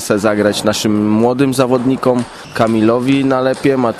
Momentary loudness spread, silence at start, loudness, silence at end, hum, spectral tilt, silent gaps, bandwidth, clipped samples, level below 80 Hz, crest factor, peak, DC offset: 3 LU; 0 s; -14 LUFS; 0 s; none; -5.5 dB/octave; none; 14 kHz; under 0.1%; -48 dBFS; 12 dB; 0 dBFS; under 0.1%